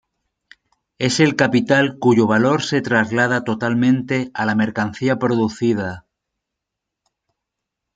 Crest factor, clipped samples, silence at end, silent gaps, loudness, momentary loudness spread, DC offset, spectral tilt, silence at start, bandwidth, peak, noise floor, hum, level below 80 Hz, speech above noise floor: 18 dB; under 0.1%; 1.95 s; none; -18 LUFS; 6 LU; under 0.1%; -5.5 dB/octave; 1 s; 9.4 kHz; -2 dBFS; -82 dBFS; none; -60 dBFS; 65 dB